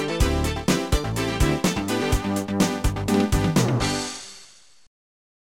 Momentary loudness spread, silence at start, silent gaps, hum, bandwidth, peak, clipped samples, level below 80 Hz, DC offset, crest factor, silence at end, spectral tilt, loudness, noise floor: 6 LU; 0 s; none; none; 17.5 kHz; -8 dBFS; under 0.1%; -30 dBFS; under 0.1%; 16 dB; 1.05 s; -5 dB/octave; -23 LUFS; -51 dBFS